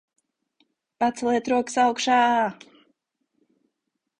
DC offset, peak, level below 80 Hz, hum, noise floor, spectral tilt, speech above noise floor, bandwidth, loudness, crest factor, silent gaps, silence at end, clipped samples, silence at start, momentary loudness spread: under 0.1%; -8 dBFS; -66 dBFS; none; -80 dBFS; -3 dB/octave; 59 dB; 10.5 kHz; -22 LUFS; 18 dB; none; 1.65 s; under 0.1%; 1 s; 7 LU